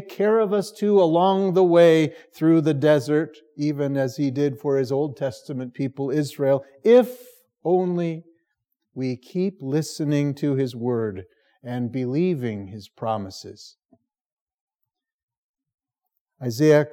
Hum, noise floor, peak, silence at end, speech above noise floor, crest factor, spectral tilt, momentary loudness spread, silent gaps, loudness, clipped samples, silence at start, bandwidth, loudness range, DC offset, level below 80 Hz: none; -82 dBFS; -4 dBFS; 0.05 s; 60 dB; 18 dB; -7 dB/octave; 15 LU; 14.21-14.47 s, 14.61-14.67 s, 14.75-14.79 s, 15.13-15.28 s, 15.38-15.54 s, 15.74-15.78 s, 16.20-16.26 s; -22 LUFS; under 0.1%; 0 s; 17 kHz; 11 LU; under 0.1%; -78 dBFS